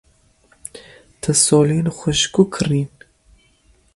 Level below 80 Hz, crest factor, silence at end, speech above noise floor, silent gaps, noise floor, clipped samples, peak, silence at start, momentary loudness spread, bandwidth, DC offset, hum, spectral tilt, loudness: -48 dBFS; 20 dB; 1.1 s; 40 dB; none; -56 dBFS; under 0.1%; 0 dBFS; 0.75 s; 23 LU; 11.5 kHz; under 0.1%; none; -4.5 dB/octave; -17 LUFS